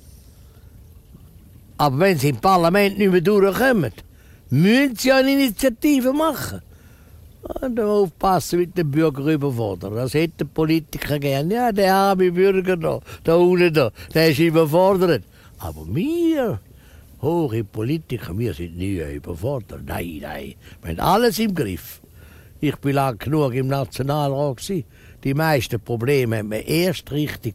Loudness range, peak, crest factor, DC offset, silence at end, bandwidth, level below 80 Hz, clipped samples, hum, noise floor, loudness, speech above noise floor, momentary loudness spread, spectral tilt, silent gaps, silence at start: 7 LU; -4 dBFS; 16 dB; under 0.1%; 0 s; 16 kHz; -44 dBFS; under 0.1%; none; -46 dBFS; -20 LUFS; 26 dB; 13 LU; -6 dB/octave; none; 0.05 s